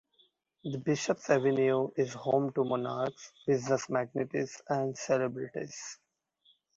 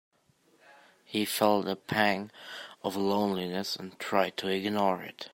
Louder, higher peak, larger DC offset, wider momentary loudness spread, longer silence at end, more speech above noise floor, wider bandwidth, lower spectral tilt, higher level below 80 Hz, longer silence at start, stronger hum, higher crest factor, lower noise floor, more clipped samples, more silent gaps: about the same, -32 LUFS vs -30 LUFS; second, -12 dBFS vs -8 dBFS; neither; about the same, 12 LU vs 10 LU; first, 0.8 s vs 0.05 s; about the same, 39 dB vs 37 dB; second, 7.8 kHz vs 16.5 kHz; about the same, -5.5 dB/octave vs -4.5 dB/octave; about the same, -74 dBFS vs -74 dBFS; about the same, 0.65 s vs 0.7 s; neither; about the same, 20 dB vs 22 dB; about the same, -70 dBFS vs -67 dBFS; neither; neither